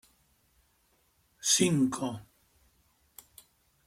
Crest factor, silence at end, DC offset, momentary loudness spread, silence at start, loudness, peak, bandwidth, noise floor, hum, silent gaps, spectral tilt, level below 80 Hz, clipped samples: 22 dB; 1.65 s; under 0.1%; 27 LU; 1.45 s; -28 LUFS; -12 dBFS; 16.5 kHz; -70 dBFS; none; none; -3.5 dB/octave; -70 dBFS; under 0.1%